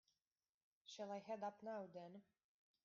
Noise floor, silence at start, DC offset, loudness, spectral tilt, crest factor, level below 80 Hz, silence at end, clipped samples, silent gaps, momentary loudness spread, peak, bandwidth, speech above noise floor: under -90 dBFS; 0.85 s; under 0.1%; -53 LUFS; -4 dB/octave; 16 dB; under -90 dBFS; 0.65 s; under 0.1%; none; 13 LU; -38 dBFS; 7.2 kHz; over 38 dB